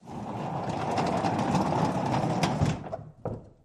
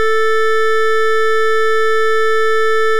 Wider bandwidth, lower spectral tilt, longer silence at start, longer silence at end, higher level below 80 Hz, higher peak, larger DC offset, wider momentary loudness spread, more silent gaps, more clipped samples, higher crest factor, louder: second, 13 kHz vs 17 kHz; first, -6.5 dB/octave vs -2 dB/octave; about the same, 0.05 s vs 0 s; first, 0.15 s vs 0 s; first, -50 dBFS vs under -90 dBFS; second, -10 dBFS vs -6 dBFS; second, under 0.1% vs 20%; first, 12 LU vs 0 LU; neither; neither; first, 20 dB vs 4 dB; second, -29 LUFS vs -14 LUFS